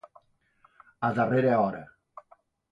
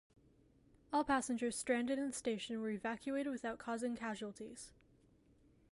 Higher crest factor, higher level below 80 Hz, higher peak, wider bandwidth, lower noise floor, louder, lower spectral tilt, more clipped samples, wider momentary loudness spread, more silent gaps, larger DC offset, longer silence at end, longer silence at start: about the same, 18 dB vs 18 dB; first, -66 dBFS vs -72 dBFS; first, -12 dBFS vs -22 dBFS; second, 7.6 kHz vs 11.5 kHz; second, -65 dBFS vs -70 dBFS; first, -26 LUFS vs -40 LUFS; first, -9 dB/octave vs -3.5 dB/octave; neither; first, 18 LU vs 12 LU; neither; neither; second, 0.85 s vs 1 s; about the same, 1 s vs 0.9 s